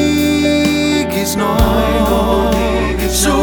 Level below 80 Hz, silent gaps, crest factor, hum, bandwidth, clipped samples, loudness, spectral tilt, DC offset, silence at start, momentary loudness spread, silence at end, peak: -22 dBFS; none; 12 dB; none; over 20 kHz; under 0.1%; -14 LUFS; -4.5 dB/octave; under 0.1%; 0 s; 3 LU; 0 s; 0 dBFS